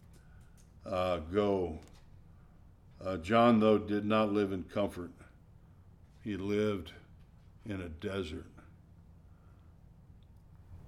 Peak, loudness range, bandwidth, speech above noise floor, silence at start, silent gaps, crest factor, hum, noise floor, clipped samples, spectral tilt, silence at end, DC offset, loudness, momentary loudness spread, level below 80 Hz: -16 dBFS; 14 LU; 12.5 kHz; 27 dB; 0.4 s; none; 20 dB; none; -58 dBFS; under 0.1%; -7 dB/octave; 0.05 s; under 0.1%; -32 LUFS; 21 LU; -58 dBFS